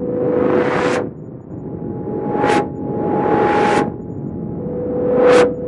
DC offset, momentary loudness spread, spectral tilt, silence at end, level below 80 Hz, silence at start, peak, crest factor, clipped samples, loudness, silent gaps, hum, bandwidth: under 0.1%; 14 LU; -6.5 dB/octave; 0 s; -46 dBFS; 0 s; 0 dBFS; 16 dB; under 0.1%; -17 LUFS; none; none; 11.5 kHz